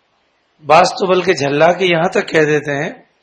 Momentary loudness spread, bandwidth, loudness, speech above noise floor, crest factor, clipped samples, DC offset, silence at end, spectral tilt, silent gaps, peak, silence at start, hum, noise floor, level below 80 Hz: 10 LU; 9.8 kHz; -13 LUFS; 47 dB; 14 dB; under 0.1%; under 0.1%; 0.25 s; -5 dB/octave; none; 0 dBFS; 0.65 s; none; -60 dBFS; -56 dBFS